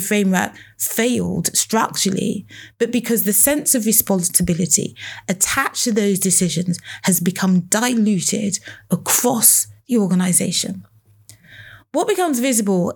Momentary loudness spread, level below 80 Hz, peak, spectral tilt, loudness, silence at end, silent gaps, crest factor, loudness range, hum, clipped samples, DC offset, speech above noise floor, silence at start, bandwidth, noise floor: 11 LU; -52 dBFS; 0 dBFS; -3.5 dB/octave; -17 LUFS; 0 s; none; 18 dB; 2 LU; none; under 0.1%; under 0.1%; 30 dB; 0 s; over 20 kHz; -48 dBFS